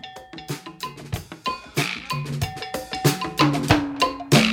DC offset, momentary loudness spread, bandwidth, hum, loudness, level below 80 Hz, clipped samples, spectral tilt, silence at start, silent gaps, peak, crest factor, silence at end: under 0.1%; 15 LU; over 20 kHz; none; -24 LUFS; -46 dBFS; under 0.1%; -4.5 dB/octave; 0.05 s; none; -2 dBFS; 22 dB; 0 s